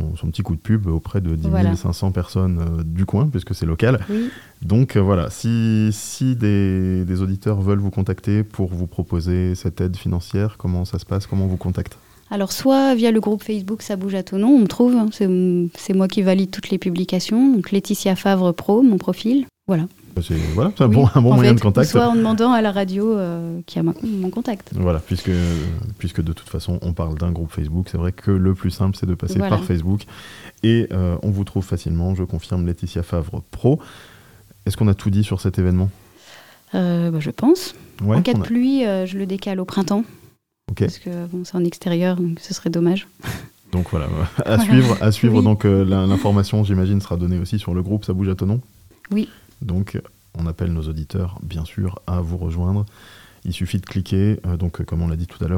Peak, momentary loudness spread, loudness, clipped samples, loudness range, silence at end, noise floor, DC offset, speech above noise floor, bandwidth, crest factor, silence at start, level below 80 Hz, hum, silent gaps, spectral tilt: 0 dBFS; 11 LU; -20 LUFS; under 0.1%; 7 LU; 0 s; -52 dBFS; 0.1%; 34 dB; 16.5 kHz; 18 dB; 0 s; -40 dBFS; none; none; -7.5 dB/octave